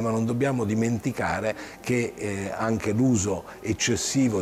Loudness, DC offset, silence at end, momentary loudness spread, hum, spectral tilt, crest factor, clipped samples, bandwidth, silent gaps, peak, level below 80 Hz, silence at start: -26 LUFS; under 0.1%; 0 s; 8 LU; none; -5 dB/octave; 12 dB; under 0.1%; 15.5 kHz; none; -12 dBFS; -52 dBFS; 0 s